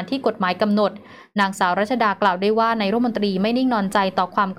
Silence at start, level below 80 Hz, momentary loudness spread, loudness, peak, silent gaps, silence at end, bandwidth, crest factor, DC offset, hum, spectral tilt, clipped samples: 0 s; -62 dBFS; 3 LU; -20 LUFS; -6 dBFS; none; 0.05 s; 14.5 kHz; 14 dB; under 0.1%; none; -6 dB/octave; under 0.1%